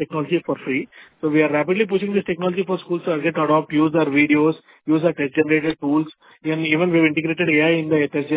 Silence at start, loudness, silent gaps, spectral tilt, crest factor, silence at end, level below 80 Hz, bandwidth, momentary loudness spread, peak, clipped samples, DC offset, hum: 0 s; -19 LUFS; none; -10 dB/octave; 16 dB; 0 s; -60 dBFS; 4 kHz; 8 LU; -4 dBFS; under 0.1%; under 0.1%; none